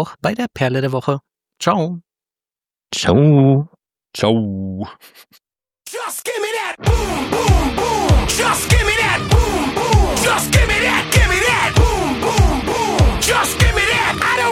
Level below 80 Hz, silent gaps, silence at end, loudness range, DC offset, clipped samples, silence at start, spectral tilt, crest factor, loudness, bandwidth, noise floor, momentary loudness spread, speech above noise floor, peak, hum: -24 dBFS; none; 0 s; 7 LU; under 0.1%; under 0.1%; 0 s; -4.5 dB/octave; 16 dB; -16 LUFS; 17 kHz; under -90 dBFS; 11 LU; over 74 dB; 0 dBFS; none